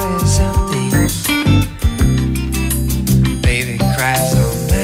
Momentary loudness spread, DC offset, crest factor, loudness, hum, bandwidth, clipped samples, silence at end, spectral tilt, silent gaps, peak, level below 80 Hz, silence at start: 4 LU; under 0.1%; 12 dB; -15 LUFS; none; 16.5 kHz; under 0.1%; 0 s; -5 dB/octave; none; -2 dBFS; -20 dBFS; 0 s